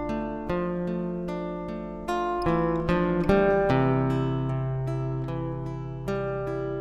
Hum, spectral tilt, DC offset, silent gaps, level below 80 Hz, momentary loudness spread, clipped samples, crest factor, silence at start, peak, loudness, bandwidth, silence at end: none; -8.5 dB/octave; under 0.1%; none; -42 dBFS; 11 LU; under 0.1%; 18 dB; 0 s; -10 dBFS; -27 LUFS; 11 kHz; 0 s